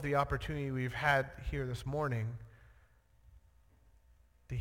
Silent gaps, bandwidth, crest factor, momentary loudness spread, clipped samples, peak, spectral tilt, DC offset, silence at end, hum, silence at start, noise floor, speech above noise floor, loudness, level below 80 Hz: none; 16.5 kHz; 22 dB; 12 LU; under 0.1%; -16 dBFS; -6.5 dB/octave; under 0.1%; 0 s; none; 0 s; -66 dBFS; 31 dB; -36 LUFS; -50 dBFS